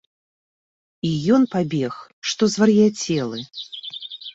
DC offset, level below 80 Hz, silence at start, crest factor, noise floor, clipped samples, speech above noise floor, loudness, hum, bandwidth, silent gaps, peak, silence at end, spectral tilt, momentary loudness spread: under 0.1%; -60 dBFS; 1.05 s; 16 dB; under -90 dBFS; under 0.1%; over 70 dB; -20 LUFS; none; 8 kHz; 2.13-2.22 s; -4 dBFS; 0 s; -5.5 dB/octave; 16 LU